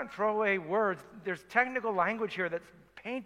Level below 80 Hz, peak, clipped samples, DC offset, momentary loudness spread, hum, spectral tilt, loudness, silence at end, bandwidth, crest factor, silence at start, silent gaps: -72 dBFS; -10 dBFS; under 0.1%; under 0.1%; 10 LU; none; -6 dB/octave; -31 LUFS; 0 s; 13.5 kHz; 22 dB; 0 s; none